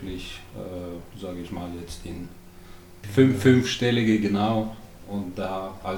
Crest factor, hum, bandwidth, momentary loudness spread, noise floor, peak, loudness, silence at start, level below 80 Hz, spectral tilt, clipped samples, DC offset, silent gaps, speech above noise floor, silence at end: 20 dB; none; over 20 kHz; 19 LU; -45 dBFS; -6 dBFS; -24 LUFS; 0 s; -48 dBFS; -6 dB/octave; under 0.1%; under 0.1%; none; 20 dB; 0 s